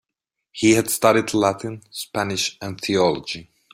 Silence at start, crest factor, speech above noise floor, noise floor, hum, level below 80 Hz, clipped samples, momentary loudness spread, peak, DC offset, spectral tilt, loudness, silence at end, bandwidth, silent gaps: 0.55 s; 20 dB; 62 dB; -83 dBFS; none; -58 dBFS; under 0.1%; 14 LU; -2 dBFS; under 0.1%; -4 dB/octave; -20 LUFS; 0.3 s; 16 kHz; none